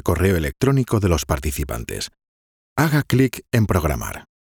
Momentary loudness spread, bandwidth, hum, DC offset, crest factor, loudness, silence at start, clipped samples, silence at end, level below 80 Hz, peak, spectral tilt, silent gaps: 11 LU; over 20 kHz; none; under 0.1%; 18 dB; -21 LUFS; 0.05 s; under 0.1%; 0.25 s; -34 dBFS; -2 dBFS; -6 dB/octave; 2.28-2.76 s